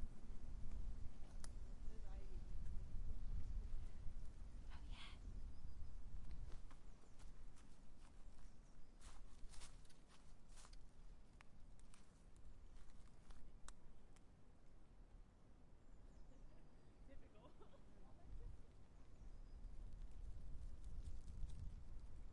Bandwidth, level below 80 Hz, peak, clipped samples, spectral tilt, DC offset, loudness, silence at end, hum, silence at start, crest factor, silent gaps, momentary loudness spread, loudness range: 11 kHz; -54 dBFS; -34 dBFS; under 0.1%; -5.5 dB/octave; under 0.1%; -61 LUFS; 0 s; none; 0 s; 16 dB; none; 13 LU; 12 LU